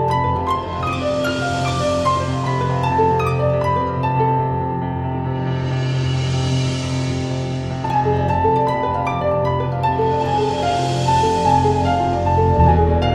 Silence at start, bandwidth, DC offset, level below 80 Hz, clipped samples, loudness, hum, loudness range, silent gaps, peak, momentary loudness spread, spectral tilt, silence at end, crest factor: 0 s; 11 kHz; under 0.1%; -34 dBFS; under 0.1%; -19 LUFS; none; 3 LU; none; -2 dBFS; 6 LU; -6.5 dB/octave; 0 s; 16 dB